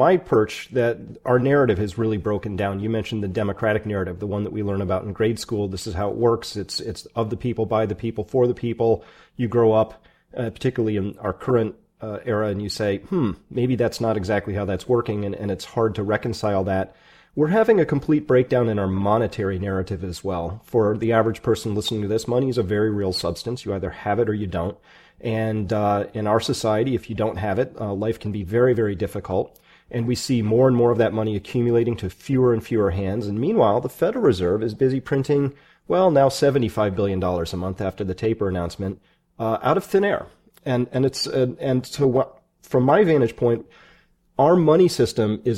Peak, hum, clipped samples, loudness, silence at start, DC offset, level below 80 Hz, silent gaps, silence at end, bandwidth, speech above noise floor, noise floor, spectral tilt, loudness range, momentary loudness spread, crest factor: -4 dBFS; none; under 0.1%; -22 LUFS; 0 s; under 0.1%; -48 dBFS; none; 0 s; 16 kHz; 35 dB; -57 dBFS; -6.5 dB/octave; 4 LU; 10 LU; 18 dB